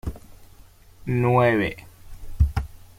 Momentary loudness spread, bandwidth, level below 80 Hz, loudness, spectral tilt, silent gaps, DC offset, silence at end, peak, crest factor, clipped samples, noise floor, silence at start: 19 LU; 16 kHz; -32 dBFS; -22 LUFS; -8 dB/octave; none; under 0.1%; 0.15 s; -6 dBFS; 18 dB; under 0.1%; -49 dBFS; 0.05 s